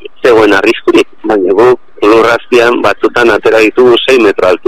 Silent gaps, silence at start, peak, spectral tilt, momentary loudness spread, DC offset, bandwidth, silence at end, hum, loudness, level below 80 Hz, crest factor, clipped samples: none; 0.05 s; 0 dBFS; -4.5 dB/octave; 4 LU; 3%; 15 kHz; 0.1 s; none; -7 LUFS; -42 dBFS; 8 dB; 1%